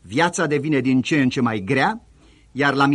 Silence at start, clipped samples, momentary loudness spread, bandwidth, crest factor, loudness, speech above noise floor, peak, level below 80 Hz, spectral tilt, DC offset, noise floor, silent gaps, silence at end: 0.05 s; under 0.1%; 4 LU; 11.5 kHz; 16 dB; -20 LUFS; 32 dB; -4 dBFS; -56 dBFS; -5.5 dB/octave; under 0.1%; -51 dBFS; none; 0 s